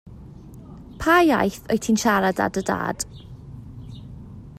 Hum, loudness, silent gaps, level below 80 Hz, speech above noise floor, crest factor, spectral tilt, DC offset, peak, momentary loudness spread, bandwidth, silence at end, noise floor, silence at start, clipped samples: none; -21 LUFS; none; -46 dBFS; 21 dB; 18 dB; -4.5 dB/octave; under 0.1%; -4 dBFS; 25 LU; 16 kHz; 0.05 s; -41 dBFS; 0.05 s; under 0.1%